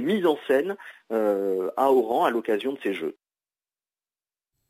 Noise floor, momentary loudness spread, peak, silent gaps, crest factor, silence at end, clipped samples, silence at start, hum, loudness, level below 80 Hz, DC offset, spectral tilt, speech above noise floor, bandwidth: under -90 dBFS; 11 LU; -8 dBFS; none; 18 dB; 1.6 s; under 0.1%; 0 s; none; -25 LUFS; -80 dBFS; under 0.1%; -6 dB/octave; over 66 dB; 16 kHz